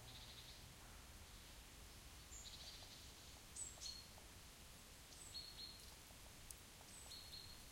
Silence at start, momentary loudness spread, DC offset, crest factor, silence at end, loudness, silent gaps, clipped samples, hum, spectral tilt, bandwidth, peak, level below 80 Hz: 0 s; 8 LU; under 0.1%; 26 dB; 0 s; -56 LUFS; none; under 0.1%; none; -1.5 dB/octave; 16.5 kHz; -34 dBFS; -66 dBFS